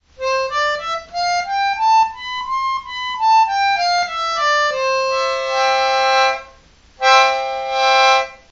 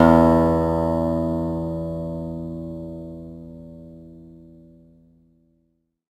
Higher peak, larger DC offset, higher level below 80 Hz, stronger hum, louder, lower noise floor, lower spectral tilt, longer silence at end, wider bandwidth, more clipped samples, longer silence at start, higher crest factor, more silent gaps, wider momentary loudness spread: about the same, 0 dBFS vs 0 dBFS; neither; second, -52 dBFS vs -40 dBFS; neither; first, -16 LUFS vs -22 LUFS; second, -48 dBFS vs -69 dBFS; second, 0.5 dB/octave vs -9 dB/octave; second, 0.15 s vs 1.8 s; second, 8 kHz vs 13 kHz; neither; first, 0.2 s vs 0 s; about the same, 18 dB vs 22 dB; neither; second, 9 LU vs 25 LU